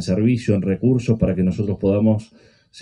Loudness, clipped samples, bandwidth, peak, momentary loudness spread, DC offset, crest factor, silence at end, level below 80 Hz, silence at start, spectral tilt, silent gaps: -19 LUFS; under 0.1%; 10.5 kHz; -4 dBFS; 3 LU; under 0.1%; 14 dB; 0 s; -42 dBFS; 0 s; -8.5 dB/octave; none